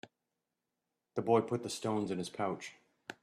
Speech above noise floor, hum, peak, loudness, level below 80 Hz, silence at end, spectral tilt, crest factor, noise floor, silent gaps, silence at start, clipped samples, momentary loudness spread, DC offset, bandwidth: 53 dB; none; -14 dBFS; -35 LUFS; -78 dBFS; 0.1 s; -5.5 dB/octave; 22 dB; -88 dBFS; none; 1.15 s; under 0.1%; 18 LU; under 0.1%; 13.5 kHz